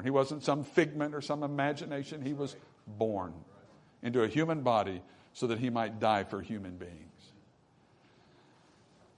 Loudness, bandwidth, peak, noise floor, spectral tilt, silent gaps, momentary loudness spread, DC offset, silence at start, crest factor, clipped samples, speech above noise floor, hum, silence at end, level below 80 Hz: -33 LUFS; 10.5 kHz; -12 dBFS; -65 dBFS; -6.5 dB/octave; none; 17 LU; under 0.1%; 0 s; 22 dB; under 0.1%; 33 dB; none; 1.9 s; -72 dBFS